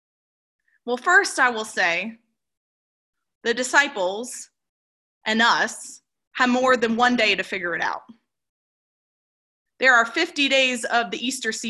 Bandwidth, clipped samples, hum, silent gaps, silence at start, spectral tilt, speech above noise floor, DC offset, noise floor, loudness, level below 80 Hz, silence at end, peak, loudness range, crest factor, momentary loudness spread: 12.5 kHz; under 0.1%; none; 2.57-3.13 s, 3.35-3.41 s, 4.69-5.21 s, 6.27-6.31 s, 8.49-9.65 s; 0.85 s; -1.5 dB/octave; over 69 dB; under 0.1%; under -90 dBFS; -20 LUFS; -70 dBFS; 0 s; -4 dBFS; 4 LU; 20 dB; 15 LU